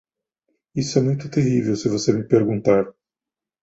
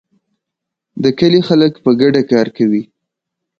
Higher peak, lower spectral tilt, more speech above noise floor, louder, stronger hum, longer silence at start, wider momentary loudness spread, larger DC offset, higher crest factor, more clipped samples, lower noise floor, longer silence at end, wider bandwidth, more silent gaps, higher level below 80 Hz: about the same, -2 dBFS vs 0 dBFS; about the same, -6.5 dB/octave vs -7.5 dB/octave; about the same, 70 dB vs 68 dB; second, -20 LUFS vs -13 LUFS; neither; second, 0.75 s vs 0.95 s; about the same, 7 LU vs 7 LU; neither; first, 20 dB vs 14 dB; neither; first, -89 dBFS vs -80 dBFS; about the same, 0.7 s vs 0.75 s; first, 8 kHz vs 7 kHz; neither; about the same, -56 dBFS vs -54 dBFS